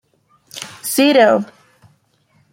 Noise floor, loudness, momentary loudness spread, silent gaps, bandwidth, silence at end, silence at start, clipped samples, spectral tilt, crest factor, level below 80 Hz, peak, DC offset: -59 dBFS; -14 LUFS; 21 LU; none; 16.5 kHz; 1.1 s; 0.55 s; under 0.1%; -3.5 dB/octave; 18 dB; -68 dBFS; -2 dBFS; under 0.1%